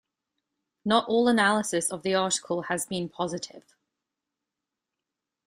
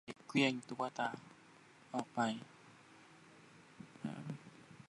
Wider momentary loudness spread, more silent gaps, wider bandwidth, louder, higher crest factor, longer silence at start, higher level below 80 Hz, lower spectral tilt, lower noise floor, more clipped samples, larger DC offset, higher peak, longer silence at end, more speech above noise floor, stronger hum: second, 11 LU vs 26 LU; neither; first, 15.5 kHz vs 11.5 kHz; first, -26 LUFS vs -40 LUFS; about the same, 22 dB vs 24 dB; first, 0.85 s vs 0.05 s; first, -70 dBFS vs -84 dBFS; second, -3.5 dB/octave vs -5 dB/octave; first, -87 dBFS vs -63 dBFS; neither; neither; first, -8 dBFS vs -18 dBFS; first, 1.9 s vs 0.05 s; first, 61 dB vs 25 dB; neither